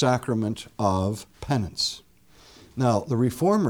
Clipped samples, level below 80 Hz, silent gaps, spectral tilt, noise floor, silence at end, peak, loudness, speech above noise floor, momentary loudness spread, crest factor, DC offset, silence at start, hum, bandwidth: under 0.1%; -52 dBFS; none; -6 dB/octave; -54 dBFS; 0 s; -8 dBFS; -26 LUFS; 30 dB; 9 LU; 16 dB; under 0.1%; 0 s; none; 19 kHz